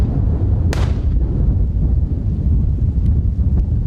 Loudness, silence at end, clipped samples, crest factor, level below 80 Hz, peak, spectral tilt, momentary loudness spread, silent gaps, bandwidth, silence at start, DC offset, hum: -18 LUFS; 0 s; under 0.1%; 12 dB; -18 dBFS; -4 dBFS; -9 dB/octave; 2 LU; none; 7.8 kHz; 0 s; under 0.1%; none